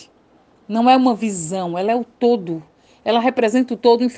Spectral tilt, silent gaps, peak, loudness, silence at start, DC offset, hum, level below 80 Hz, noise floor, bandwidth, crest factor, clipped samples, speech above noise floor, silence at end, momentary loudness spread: -5 dB/octave; none; -2 dBFS; -18 LUFS; 0 s; under 0.1%; none; -64 dBFS; -54 dBFS; 9.4 kHz; 18 dB; under 0.1%; 37 dB; 0 s; 11 LU